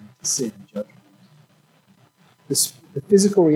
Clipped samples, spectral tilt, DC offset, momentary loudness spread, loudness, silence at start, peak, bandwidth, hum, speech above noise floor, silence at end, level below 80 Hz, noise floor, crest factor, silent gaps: under 0.1%; -4.5 dB/octave; under 0.1%; 17 LU; -21 LUFS; 0.25 s; -2 dBFS; 17.5 kHz; none; 38 dB; 0 s; -70 dBFS; -57 dBFS; 20 dB; none